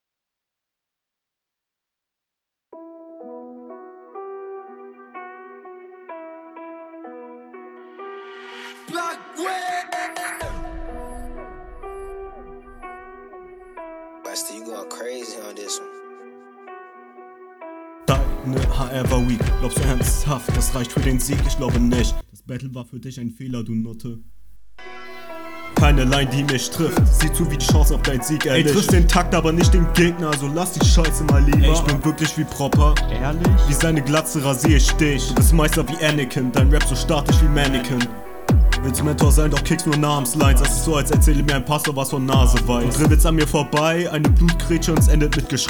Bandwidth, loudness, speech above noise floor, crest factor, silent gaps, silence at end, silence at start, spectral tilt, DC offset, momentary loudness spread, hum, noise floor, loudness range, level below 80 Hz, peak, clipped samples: over 20 kHz; -19 LUFS; 68 dB; 16 dB; none; 0 s; 2.75 s; -5 dB/octave; under 0.1%; 22 LU; none; -85 dBFS; 20 LU; -22 dBFS; -2 dBFS; under 0.1%